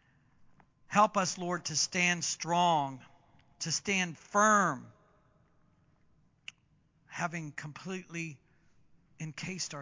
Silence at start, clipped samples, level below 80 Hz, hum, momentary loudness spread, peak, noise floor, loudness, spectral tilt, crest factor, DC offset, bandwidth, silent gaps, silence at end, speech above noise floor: 0.9 s; under 0.1%; -74 dBFS; none; 18 LU; -12 dBFS; -69 dBFS; -31 LUFS; -3 dB/octave; 22 dB; under 0.1%; 7.8 kHz; none; 0 s; 38 dB